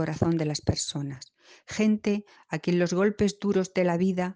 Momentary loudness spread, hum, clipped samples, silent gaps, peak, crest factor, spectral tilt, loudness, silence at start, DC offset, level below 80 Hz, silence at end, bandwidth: 11 LU; none; under 0.1%; none; -10 dBFS; 18 dB; -6 dB/octave; -27 LUFS; 0 s; under 0.1%; -54 dBFS; 0 s; 9.8 kHz